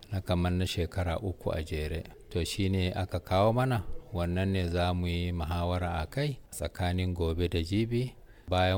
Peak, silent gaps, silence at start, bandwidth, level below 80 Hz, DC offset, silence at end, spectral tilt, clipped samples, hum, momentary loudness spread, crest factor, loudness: -14 dBFS; none; 0 s; 17 kHz; -42 dBFS; under 0.1%; 0 s; -6.5 dB/octave; under 0.1%; none; 6 LU; 16 dB; -31 LUFS